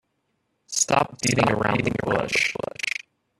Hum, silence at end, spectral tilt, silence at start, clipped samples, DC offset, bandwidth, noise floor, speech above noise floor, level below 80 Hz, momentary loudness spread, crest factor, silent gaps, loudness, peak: none; 0.5 s; -3.5 dB/octave; 0.7 s; under 0.1%; under 0.1%; 13.5 kHz; -73 dBFS; 51 dB; -52 dBFS; 8 LU; 22 dB; none; -23 LUFS; -2 dBFS